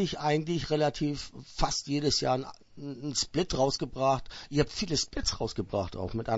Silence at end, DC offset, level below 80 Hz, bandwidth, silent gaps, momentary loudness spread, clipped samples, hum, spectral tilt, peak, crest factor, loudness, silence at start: 0 s; under 0.1%; -44 dBFS; 8 kHz; none; 8 LU; under 0.1%; none; -4.5 dB/octave; -10 dBFS; 20 dB; -30 LUFS; 0 s